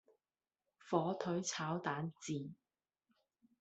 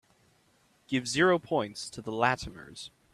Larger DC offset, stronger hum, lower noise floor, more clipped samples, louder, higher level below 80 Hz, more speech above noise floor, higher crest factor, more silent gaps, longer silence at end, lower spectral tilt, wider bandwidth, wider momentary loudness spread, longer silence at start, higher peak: neither; neither; first, under -90 dBFS vs -67 dBFS; neither; second, -40 LUFS vs -29 LUFS; second, -82 dBFS vs -60 dBFS; first, over 50 dB vs 37 dB; about the same, 24 dB vs 22 dB; neither; first, 1.05 s vs 0.25 s; about the same, -5 dB/octave vs -4.5 dB/octave; second, 8.2 kHz vs 13 kHz; second, 7 LU vs 19 LU; about the same, 0.85 s vs 0.9 s; second, -20 dBFS vs -8 dBFS